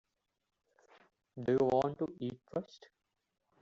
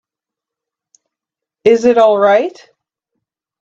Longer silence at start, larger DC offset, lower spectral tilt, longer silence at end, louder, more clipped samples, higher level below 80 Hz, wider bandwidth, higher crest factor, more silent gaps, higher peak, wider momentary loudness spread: second, 1.35 s vs 1.65 s; neither; first, -6.5 dB/octave vs -5 dB/octave; second, 1 s vs 1.15 s; second, -35 LUFS vs -11 LUFS; neither; second, -72 dBFS vs -64 dBFS; about the same, 7.4 kHz vs 7.8 kHz; about the same, 20 dB vs 16 dB; neither; second, -18 dBFS vs 0 dBFS; first, 18 LU vs 7 LU